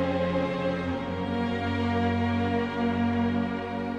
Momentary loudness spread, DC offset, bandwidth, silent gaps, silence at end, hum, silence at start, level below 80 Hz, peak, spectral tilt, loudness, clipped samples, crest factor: 4 LU; under 0.1%; 8.2 kHz; none; 0 s; none; 0 s; -56 dBFS; -16 dBFS; -8 dB/octave; -28 LUFS; under 0.1%; 12 dB